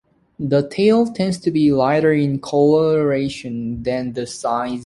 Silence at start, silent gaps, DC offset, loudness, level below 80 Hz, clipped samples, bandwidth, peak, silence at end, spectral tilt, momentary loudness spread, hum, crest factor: 0.4 s; none; under 0.1%; -18 LUFS; -50 dBFS; under 0.1%; 11.5 kHz; -4 dBFS; 0 s; -7 dB/octave; 9 LU; none; 14 dB